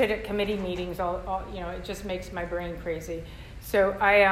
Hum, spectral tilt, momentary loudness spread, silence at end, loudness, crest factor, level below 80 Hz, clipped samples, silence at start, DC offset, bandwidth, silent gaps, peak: none; -5 dB/octave; 13 LU; 0 s; -29 LUFS; 18 dB; -44 dBFS; under 0.1%; 0 s; under 0.1%; 15.5 kHz; none; -8 dBFS